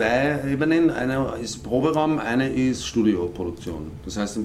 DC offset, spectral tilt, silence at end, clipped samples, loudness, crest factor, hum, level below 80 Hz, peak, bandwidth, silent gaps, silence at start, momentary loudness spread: under 0.1%; -5.5 dB/octave; 0 s; under 0.1%; -23 LUFS; 16 dB; none; -44 dBFS; -8 dBFS; 13.5 kHz; none; 0 s; 11 LU